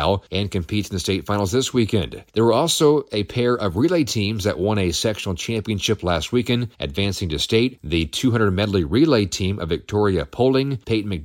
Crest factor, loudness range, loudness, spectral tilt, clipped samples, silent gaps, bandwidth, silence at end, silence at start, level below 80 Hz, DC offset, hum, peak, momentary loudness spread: 16 dB; 2 LU; -21 LUFS; -5 dB/octave; under 0.1%; none; 17 kHz; 0 s; 0 s; -40 dBFS; under 0.1%; none; -4 dBFS; 7 LU